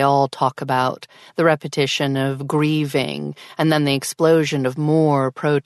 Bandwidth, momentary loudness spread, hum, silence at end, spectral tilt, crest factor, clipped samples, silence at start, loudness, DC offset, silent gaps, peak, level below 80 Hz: 12.5 kHz; 7 LU; none; 0.05 s; -5.5 dB/octave; 16 dB; under 0.1%; 0 s; -19 LUFS; under 0.1%; none; -4 dBFS; -62 dBFS